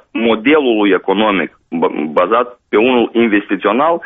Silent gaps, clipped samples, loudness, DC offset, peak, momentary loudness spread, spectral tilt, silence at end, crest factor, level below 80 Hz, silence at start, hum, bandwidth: none; under 0.1%; -13 LUFS; under 0.1%; 0 dBFS; 6 LU; -3 dB/octave; 0 s; 12 dB; -54 dBFS; 0.15 s; none; 3.9 kHz